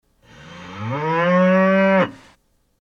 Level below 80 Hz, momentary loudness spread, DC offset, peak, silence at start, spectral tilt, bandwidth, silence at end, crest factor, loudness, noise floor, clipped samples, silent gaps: -60 dBFS; 18 LU; under 0.1%; -4 dBFS; 0.45 s; -8 dB/octave; 6.8 kHz; 0.65 s; 14 dB; -17 LUFS; -59 dBFS; under 0.1%; none